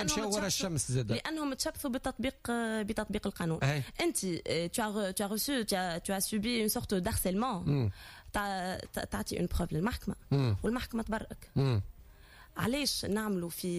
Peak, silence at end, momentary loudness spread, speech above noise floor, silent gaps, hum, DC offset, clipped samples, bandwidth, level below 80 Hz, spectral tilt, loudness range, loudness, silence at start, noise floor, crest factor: -18 dBFS; 0 s; 6 LU; 22 dB; none; none; under 0.1%; under 0.1%; 15.5 kHz; -50 dBFS; -4.5 dB/octave; 2 LU; -33 LUFS; 0 s; -56 dBFS; 14 dB